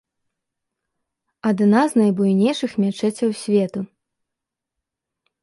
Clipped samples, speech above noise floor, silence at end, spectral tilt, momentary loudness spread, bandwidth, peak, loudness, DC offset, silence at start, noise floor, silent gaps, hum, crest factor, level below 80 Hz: under 0.1%; 66 dB; 1.6 s; -6.5 dB/octave; 10 LU; 11.5 kHz; -4 dBFS; -19 LUFS; under 0.1%; 1.45 s; -84 dBFS; none; none; 18 dB; -66 dBFS